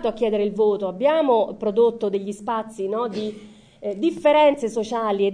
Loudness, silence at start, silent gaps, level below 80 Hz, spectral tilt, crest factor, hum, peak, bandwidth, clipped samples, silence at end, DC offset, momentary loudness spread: -21 LUFS; 0 s; none; -58 dBFS; -6 dB/octave; 16 dB; none; -6 dBFS; 10 kHz; under 0.1%; 0 s; under 0.1%; 10 LU